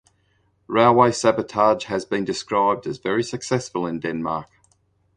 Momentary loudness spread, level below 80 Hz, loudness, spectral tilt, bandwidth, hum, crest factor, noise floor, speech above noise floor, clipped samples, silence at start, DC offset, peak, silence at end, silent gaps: 10 LU; -58 dBFS; -21 LUFS; -5 dB/octave; 10.5 kHz; none; 20 dB; -64 dBFS; 44 dB; under 0.1%; 0.7 s; under 0.1%; -2 dBFS; 0.75 s; none